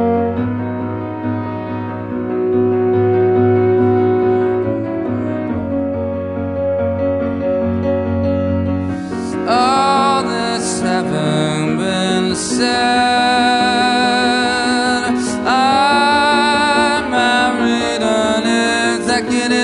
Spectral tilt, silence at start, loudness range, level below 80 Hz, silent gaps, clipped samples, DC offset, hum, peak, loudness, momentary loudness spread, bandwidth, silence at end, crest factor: -4.5 dB/octave; 0 s; 5 LU; -46 dBFS; none; under 0.1%; under 0.1%; none; -2 dBFS; -15 LUFS; 9 LU; 11.5 kHz; 0 s; 14 dB